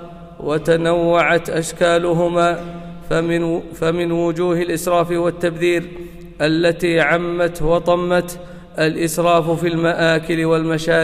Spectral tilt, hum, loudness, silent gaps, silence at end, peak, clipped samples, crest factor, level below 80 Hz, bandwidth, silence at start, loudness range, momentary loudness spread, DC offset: -5.5 dB/octave; none; -17 LUFS; none; 0 s; -4 dBFS; under 0.1%; 14 dB; -40 dBFS; 16 kHz; 0 s; 2 LU; 9 LU; under 0.1%